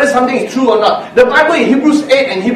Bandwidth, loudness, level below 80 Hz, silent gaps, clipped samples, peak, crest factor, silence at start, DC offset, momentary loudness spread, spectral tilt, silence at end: 13 kHz; -10 LUFS; -48 dBFS; none; 0.3%; 0 dBFS; 10 dB; 0 s; under 0.1%; 4 LU; -4.5 dB/octave; 0 s